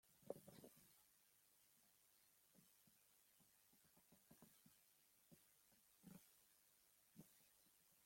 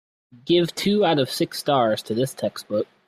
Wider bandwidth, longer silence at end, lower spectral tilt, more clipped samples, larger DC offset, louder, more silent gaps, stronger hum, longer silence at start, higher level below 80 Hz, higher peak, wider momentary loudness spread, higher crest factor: about the same, 16.5 kHz vs 15.5 kHz; second, 0 s vs 0.25 s; about the same, -4 dB/octave vs -5 dB/octave; neither; neither; second, -64 LUFS vs -22 LUFS; neither; neither; second, 0.05 s vs 0.35 s; second, under -90 dBFS vs -64 dBFS; second, -36 dBFS vs -6 dBFS; about the same, 10 LU vs 8 LU; first, 34 dB vs 16 dB